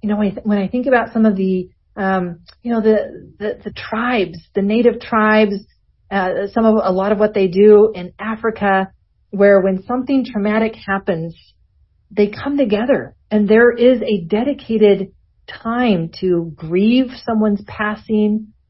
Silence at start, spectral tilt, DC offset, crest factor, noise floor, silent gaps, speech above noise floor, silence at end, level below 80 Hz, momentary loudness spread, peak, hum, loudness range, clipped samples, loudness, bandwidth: 0 s; -11 dB/octave; under 0.1%; 16 dB; -56 dBFS; none; 40 dB; 0.25 s; -48 dBFS; 13 LU; 0 dBFS; none; 4 LU; under 0.1%; -16 LUFS; 5.8 kHz